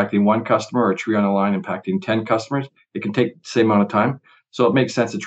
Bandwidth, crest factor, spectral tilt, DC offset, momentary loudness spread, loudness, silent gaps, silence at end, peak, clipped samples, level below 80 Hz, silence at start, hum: 8.2 kHz; 16 dB; -6.5 dB/octave; under 0.1%; 9 LU; -20 LUFS; none; 0 s; -2 dBFS; under 0.1%; -76 dBFS; 0 s; none